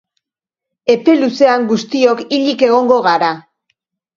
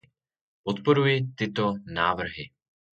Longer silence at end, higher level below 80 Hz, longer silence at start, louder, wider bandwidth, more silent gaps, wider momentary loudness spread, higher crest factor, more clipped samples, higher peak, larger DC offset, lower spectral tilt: first, 0.75 s vs 0.5 s; second, -62 dBFS vs -56 dBFS; first, 0.85 s vs 0.65 s; first, -13 LUFS vs -26 LUFS; about the same, 7.4 kHz vs 7.6 kHz; neither; second, 6 LU vs 15 LU; second, 14 dB vs 20 dB; neither; first, 0 dBFS vs -8 dBFS; neither; second, -5 dB/octave vs -7 dB/octave